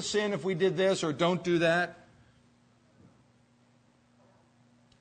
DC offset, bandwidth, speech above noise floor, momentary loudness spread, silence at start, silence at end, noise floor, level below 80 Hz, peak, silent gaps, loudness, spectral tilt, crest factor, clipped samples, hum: under 0.1%; 9.6 kHz; 37 dB; 4 LU; 0 s; 3.05 s; -65 dBFS; -70 dBFS; -14 dBFS; none; -28 LUFS; -5 dB/octave; 18 dB; under 0.1%; none